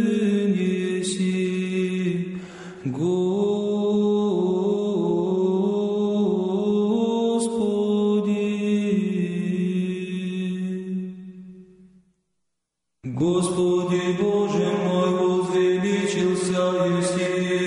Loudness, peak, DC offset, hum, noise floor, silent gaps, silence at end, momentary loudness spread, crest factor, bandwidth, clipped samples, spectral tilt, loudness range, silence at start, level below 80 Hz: -23 LUFS; -12 dBFS; under 0.1%; none; -78 dBFS; none; 0 s; 7 LU; 10 dB; 11 kHz; under 0.1%; -6.5 dB/octave; 7 LU; 0 s; -62 dBFS